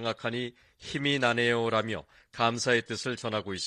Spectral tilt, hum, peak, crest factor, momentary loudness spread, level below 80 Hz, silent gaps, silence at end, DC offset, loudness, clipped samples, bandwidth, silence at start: -4 dB/octave; none; -10 dBFS; 20 dB; 13 LU; -64 dBFS; none; 0 s; under 0.1%; -29 LUFS; under 0.1%; 11.5 kHz; 0 s